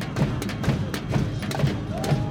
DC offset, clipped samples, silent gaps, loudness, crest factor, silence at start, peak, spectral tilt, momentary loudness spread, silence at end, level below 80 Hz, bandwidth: under 0.1%; under 0.1%; none; -26 LUFS; 14 dB; 0 s; -10 dBFS; -6.5 dB/octave; 2 LU; 0 s; -40 dBFS; 17 kHz